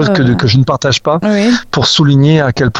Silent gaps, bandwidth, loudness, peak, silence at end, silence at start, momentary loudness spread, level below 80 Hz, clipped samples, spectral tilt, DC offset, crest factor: none; 9.6 kHz; -10 LUFS; 0 dBFS; 0 s; 0 s; 4 LU; -38 dBFS; under 0.1%; -5.5 dB/octave; under 0.1%; 10 dB